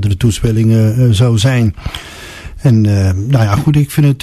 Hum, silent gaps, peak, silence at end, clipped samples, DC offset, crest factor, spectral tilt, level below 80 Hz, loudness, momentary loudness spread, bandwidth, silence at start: none; none; 0 dBFS; 0 s; under 0.1%; under 0.1%; 10 dB; -6.5 dB/octave; -30 dBFS; -12 LUFS; 15 LU; 13.5 kHz; 0 s